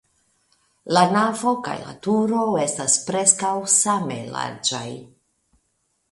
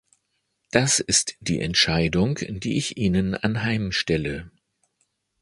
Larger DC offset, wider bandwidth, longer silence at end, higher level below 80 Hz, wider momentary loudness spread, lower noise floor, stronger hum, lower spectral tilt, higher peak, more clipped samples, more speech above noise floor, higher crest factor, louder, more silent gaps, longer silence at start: neither; about the same, 11.5 kHz vs 11.5 kHz; about the same, 1.05 s vs 0.95 s; second, -64 dBFS vs -44 dBFS; first, 12 LU vs 8 LU; about the same, -71 dBFS vs -74 dBFS; neither; about the same, -3 dB/octave vs -3.5 dB/octave; about the same, 0 dBFS vs 0 dBFS; neither; about the same, 50 dB vs 51 dB; about the same, 22 dB vs 24 dB; about the same, -20 LUFS vs -22 LUFS; neither; about the same, 0.85 s vs 0.75 s